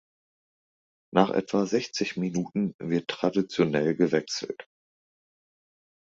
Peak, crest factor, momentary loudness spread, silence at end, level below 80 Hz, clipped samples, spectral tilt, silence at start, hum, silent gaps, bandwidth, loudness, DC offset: -6 dBFS; 22 dB; 7 LU; 1.5 s; -66 dBFS; under 0.1%; -5.5 dB/octave; 1.15 s; none; 2.74-2.79 s; 7.8 kHz; -27 LUFS; under 0.1%